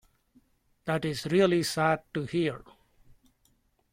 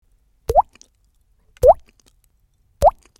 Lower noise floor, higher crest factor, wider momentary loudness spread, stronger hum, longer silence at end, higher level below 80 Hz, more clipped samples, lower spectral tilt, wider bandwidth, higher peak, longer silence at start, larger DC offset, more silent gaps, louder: first, -69 dBFS vs -61 dBFS; about the same, 20 dB vs 20 dB; second, 9 LU vs 13 LU; neither; first, 1.35 s vs 0.3 s; second, -62 dBFS vs -36 dBFS; neither; about the same, -5.5 dB/octave vs -6 dB/octave; about the same, 16 kHz vs 16.5 kHz; second, -12 dBFS vs 0 dBFS; first, 0.85 s vs 0.5 s; neither; neither; second, -28 LUFS vs -17 LUFS